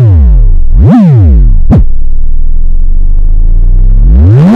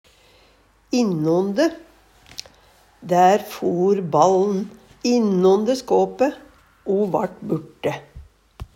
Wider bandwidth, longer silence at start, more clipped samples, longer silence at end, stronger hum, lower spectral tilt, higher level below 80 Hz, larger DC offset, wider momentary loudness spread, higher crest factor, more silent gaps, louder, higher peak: second, 2.7 kHz vs 16 kHz; second, 0 s vs 0.9 s; first, 30% vs under 0.1%; about the same, 0 s vs 0.1 s; neither; first, -11 dB/octave vs -6 dB/octave; first, -4 dBFS vs -52 dBFS; neither; second, 11 LU vs 18 LU; second, 2 dB vs 20 dB; neither; first, -7 LUFS vs -20 LUFS; about the same, 0 dBFS vs -2 dBFS